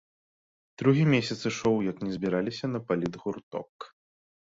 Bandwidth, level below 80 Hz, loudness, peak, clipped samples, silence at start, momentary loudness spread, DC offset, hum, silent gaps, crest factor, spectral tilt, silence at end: 7.8 kHz; -62 dBFS; -28 LUFS; -10 dBFS; under 0.1%; 0.8 s; 16 LU; under 0.1%; none; 3.43-3.51 s, 3.69-3.79 s; 20 dB; -6.5 dB/octave; 0.65 s